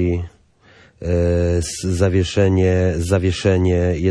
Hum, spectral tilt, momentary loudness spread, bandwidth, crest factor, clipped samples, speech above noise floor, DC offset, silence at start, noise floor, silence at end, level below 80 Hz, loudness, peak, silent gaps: none; -6.5 dB/octave; 6 LU; 11 kHz; 14 dB; under 0.1%; 34 dB; under 0.1%; 0 s; -50 dBFS; 0 s; -34 dBFS; -18 LUFS; -4 dBFS; none